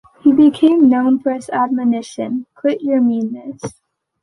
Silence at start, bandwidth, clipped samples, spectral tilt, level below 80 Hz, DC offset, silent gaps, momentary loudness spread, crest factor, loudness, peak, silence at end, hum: 0.25 s; 11.5 kHz; under 0.1%; -6.5 dB/octave; -60 dBFS; under 0.1%; none; 15 LU; 14 dB; -15 LUFS; -2 dBFS; 0.55 s; none